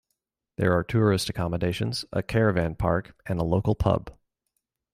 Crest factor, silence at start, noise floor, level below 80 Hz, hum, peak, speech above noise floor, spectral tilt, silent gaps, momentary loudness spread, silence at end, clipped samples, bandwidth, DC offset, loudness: 18 dB; 0.6 s; -81 dBFS; -44 dBFS; none; -8 dBFS; 56 dB; -6.5 dB/octave; none; 7 LU; 0.8 s; under 0.1%; 15.5 kHz; under 0.1%; -26 LUFS